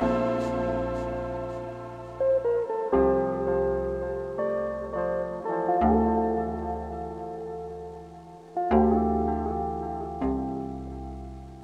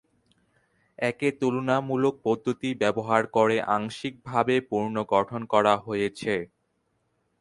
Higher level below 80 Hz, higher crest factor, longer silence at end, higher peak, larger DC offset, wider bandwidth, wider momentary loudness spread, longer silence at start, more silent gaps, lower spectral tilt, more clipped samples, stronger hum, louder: first, -42 dBFS vs -64 dBFS; about the same, 20 dB vs 22 dB; second, 0 s vs 0.95 s; about the same, -8 dBFS vs -6 dBFS; neither; second, 9 kHz vs 11.5 kHz; first, 16 LU vs 7 LU; second, 0 s vs 1 s; neither; first, -9 dB/octave vs -6 dB/octave; neither; neither; about the same, -28 LUFS vs -26 LUFS